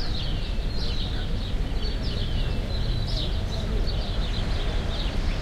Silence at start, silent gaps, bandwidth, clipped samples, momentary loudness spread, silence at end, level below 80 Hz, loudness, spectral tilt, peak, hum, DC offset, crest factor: 0 s; none; 11 kHz; under 0.1%; 2 LU; 0 s; -26 dBFS; -29 LUFS; -6 dB/octave; -14 dBFS; none; under 0.1%; 12 dB